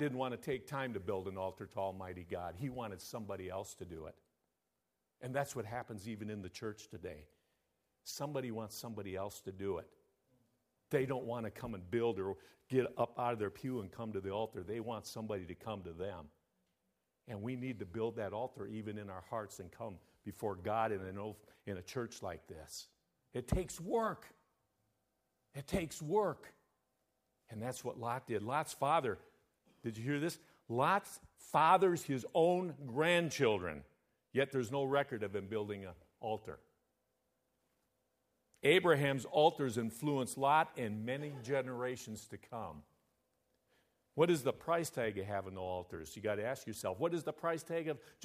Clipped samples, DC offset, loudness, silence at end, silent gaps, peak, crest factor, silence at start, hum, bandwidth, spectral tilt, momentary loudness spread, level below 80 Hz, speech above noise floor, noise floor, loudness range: under 0.1%; under 0.1%; -38 LUFS; 0 s; none; -16 dBFS; 24 dB; 0 s; none; 15.5 kHz; -5.5 dB/octave; 17 LU; -64 dBFS; 49 dB; -87 dBFS; 12 LU